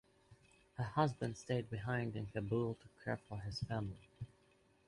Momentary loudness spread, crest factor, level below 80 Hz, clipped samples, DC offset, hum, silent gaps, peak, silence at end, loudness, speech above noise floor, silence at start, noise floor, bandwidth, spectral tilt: 16 LU; 22 dB; -64 dBFS; under 0.1%; under 0.1%; none; none; -20 dBFS; 0.6 s; -41 LUFS; 31 dB; 0.3 s; -72 dBFS; 11.5 kHz; -7 dB/octave